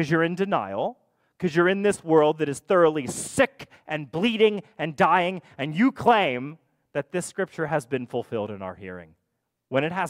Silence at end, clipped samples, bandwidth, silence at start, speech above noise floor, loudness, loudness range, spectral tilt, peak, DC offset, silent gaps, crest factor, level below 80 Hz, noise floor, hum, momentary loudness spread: 0 s; under 0.1%; 16 kHz; 0 s; 55 dB; -24 LUFS; 7 LU; -5 dB/octave; -6 dBFS; under 0.1%; none; 18 dB; -64 dBFS; -78 dBFS; none; 13 LU